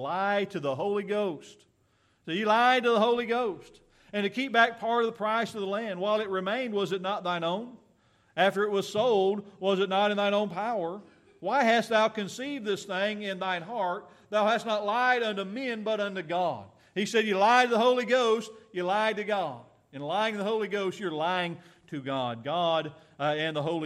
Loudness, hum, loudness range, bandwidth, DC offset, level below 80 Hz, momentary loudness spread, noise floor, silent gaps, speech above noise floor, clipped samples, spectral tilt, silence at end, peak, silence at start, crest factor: -28 LUFS; none; 4 LU; 14 kHz; under 0.1%; -76 dBFS; 11 LU; -68 dBFS; none; 40 dB; under 0.1%; -4.5 dB/octave; 0 s; -8 dBFS; 0 s; 20 dB